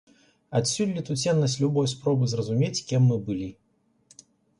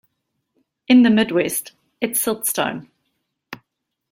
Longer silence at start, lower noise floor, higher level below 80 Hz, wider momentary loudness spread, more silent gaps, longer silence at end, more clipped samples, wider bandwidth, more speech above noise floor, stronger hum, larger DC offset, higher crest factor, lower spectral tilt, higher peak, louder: second, 0.5 s vs 0.9 s; second, -61 dBFS vs -77 dBFS; about the same, -60 dBFS vs -62 dBFS; second, 6 LU vs 26 LU; neither; first, 1.05 s vs 0.55 s; neither; second, 11.5 kHz vs 16.5 kHz; second, 37 dB vs 60 dB; neither; neither; about the same, 14 dB vs 18 dB; first, -5.5 dB/octave vs -3.5 dB/octave; second, -12 dBFS vs -2 dBFS; second, -25 LUFS vs -18 LUFS